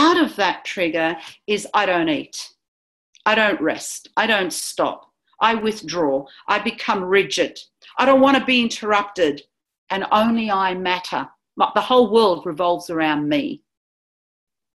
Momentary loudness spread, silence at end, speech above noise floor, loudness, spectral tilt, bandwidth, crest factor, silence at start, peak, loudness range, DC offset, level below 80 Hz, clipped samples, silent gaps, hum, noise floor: 12 LU; 1.2 s; over 71 dB; -19 LUFS; -3.5 dB/octave; 13 kHz; 18 dB; 0 s; -2 dBFS; 3 LU; under 0.1%; -60 dBFS; under 0.1%; 2.68-3.13 s, 9.78-9.87 s; none; under -90 dBFS